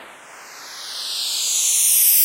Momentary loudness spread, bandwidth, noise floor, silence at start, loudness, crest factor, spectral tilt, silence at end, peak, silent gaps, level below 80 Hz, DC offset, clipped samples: 21 LU; 16 kHz; -41 dBFS; 0 s; -16 LUFS; 16 dB; 4.5 dB/octave; 0 s; -4 dBFS; none; -78 dBFS; under 0.1%; under 0.1%